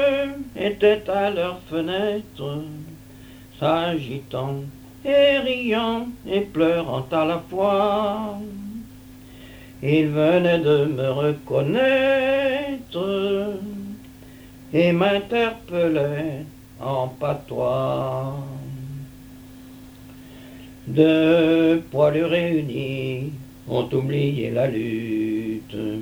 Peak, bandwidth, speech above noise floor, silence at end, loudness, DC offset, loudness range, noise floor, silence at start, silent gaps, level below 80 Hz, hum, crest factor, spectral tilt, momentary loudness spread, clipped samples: -4 dBFS; over 20 kHz; 22 dB; 0 s; -22 LUFS; under 0.1%; 7 LU; -43 dBFS; 0 s; none; -52 dBFS; none; 18 dB; -7 dB/octave; 18 LU; under 0.1%